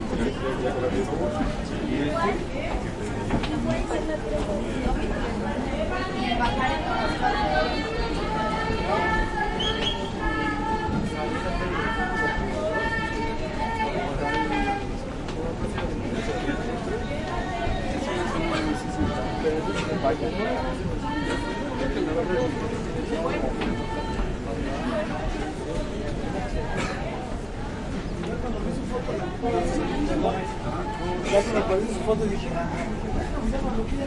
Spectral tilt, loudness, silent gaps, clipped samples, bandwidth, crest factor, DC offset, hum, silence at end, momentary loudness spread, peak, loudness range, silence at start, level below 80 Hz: -6 dB/octave; -27 LUFS; none; under 0.1%; 11.5 kHz; 18 dB; under 0.1%; none; 0 s; 6 LU; -8 dBFS; 4 LU; 0 s; -34 dBFS